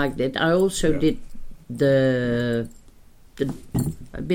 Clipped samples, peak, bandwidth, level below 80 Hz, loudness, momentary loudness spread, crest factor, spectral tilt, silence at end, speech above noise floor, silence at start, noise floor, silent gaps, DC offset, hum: under 0.1%; -8 dBFS; 17 kHz; -40 dBFS; -23 LUFS; 14 LU; 14 dB; -6 dB/octave; 0 s; 26 dB; 0 s; -48 dBFS; none; under 0.1%; none